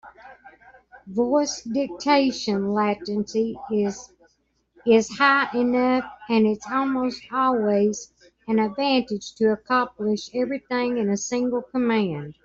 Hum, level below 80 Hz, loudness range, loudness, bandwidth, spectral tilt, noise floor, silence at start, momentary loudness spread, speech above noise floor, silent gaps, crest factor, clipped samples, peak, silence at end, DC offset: none; -62 dBFS; 3 LU; -23 LUFS; 7.8 kHz; -4.5 dB/octave; -68 dBFS; 0.05 s; 7 LU; 45 dB; none; 20 dB; under 0.1%; -4 dBFS; 0.15 s; under 0.1%